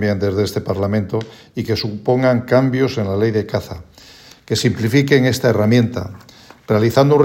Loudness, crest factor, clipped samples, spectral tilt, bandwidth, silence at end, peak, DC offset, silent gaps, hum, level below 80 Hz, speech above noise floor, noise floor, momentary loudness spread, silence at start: -17 LUFS; 16 dB; under 0.1%; -6.5 dB/octave; 16.5 kHz; 0 s; 0 dBFS; under 0.1%; none; none; -52 dBFS; 27 dB; -43 dBFS; 11 LU; 0 s